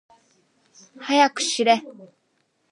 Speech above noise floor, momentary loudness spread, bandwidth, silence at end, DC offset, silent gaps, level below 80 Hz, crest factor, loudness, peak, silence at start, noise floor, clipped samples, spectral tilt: 48 dB; 4 LU; 11.5 kHz; 0.65 s; under 0.1%; none; -86 dBFS; 22 dB; -20 LUFS; -4 dBFS; 1 s; -69 dBFS; under 0.1%; -1.5 dB/octave